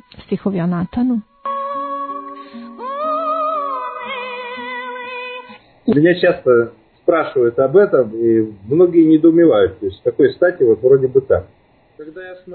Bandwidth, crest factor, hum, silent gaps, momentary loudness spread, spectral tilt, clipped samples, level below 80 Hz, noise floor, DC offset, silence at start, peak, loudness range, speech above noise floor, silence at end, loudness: 4.5 kHz; 14 dB; none; none; 16 LU; -11.5 dB/octave; under 0.1%; -52 dBFS; -39 dBFS; under 0.1%; 0.2 s; -2 dBFS; 9 LU; 25 dB; 0 s; -16 LUFS